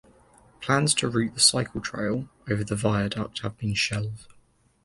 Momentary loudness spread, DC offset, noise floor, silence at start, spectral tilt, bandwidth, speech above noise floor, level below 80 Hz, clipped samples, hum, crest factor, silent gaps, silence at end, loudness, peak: 13 LU; under 0.1%; -61 dBFS; 0.6 s; -3.5 dB/octave; 11.5 kHz; 35 dB; -52 dBFS; under 0.1%; none; 22 dB; none; 0.6 s; -25 LUFS; -6 dBFS